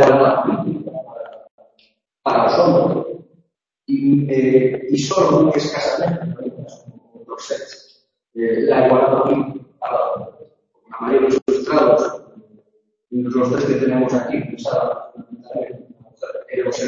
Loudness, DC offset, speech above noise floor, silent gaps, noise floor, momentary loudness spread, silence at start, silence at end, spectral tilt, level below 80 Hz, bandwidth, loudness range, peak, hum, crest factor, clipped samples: -18 LUFS; under 0.1%; 47 dB; 1.51-1.58 s, 11.42-11.46 s; -63 dBFS; 20 LU; 0 s; 0 s; -6.5 dB/octave; -58 dBFS; 7.6 kHz; 4 LU; 0 dBFS; none; 18 dB; under 0.1%